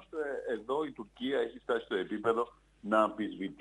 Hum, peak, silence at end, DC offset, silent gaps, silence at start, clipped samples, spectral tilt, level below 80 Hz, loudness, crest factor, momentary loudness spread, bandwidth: none; -14 dBFS; 0.05 s; under 0.1%; none; 0 s; under 0.1%; -6 dB/octave; -68 dBFS; -34 LUFS; 20 dB; 10 LU; 10 kHz